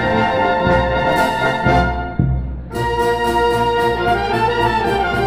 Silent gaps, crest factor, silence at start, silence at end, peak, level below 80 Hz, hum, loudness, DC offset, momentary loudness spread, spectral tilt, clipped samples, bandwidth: none; 14 dB; 0 s; 0 s; -2 dBFS; -28 dBFS; none; -16 LUFS; 0.6%; 5 LU; -6 dB/octave; under 0.1%; 16 kHz